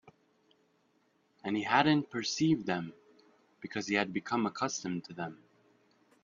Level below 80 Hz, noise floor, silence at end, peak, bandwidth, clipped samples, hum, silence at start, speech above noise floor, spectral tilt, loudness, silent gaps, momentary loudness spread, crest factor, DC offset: -72 dBFS; -72 dBFS; 0.9 s; -10 dBFS; 7.4 kHz; under 0.1%; none; 0.05 s; 40 dB; -4.5 dB/octave; -32 LUFS; none; 15 LU; 26 dB; under 0.1%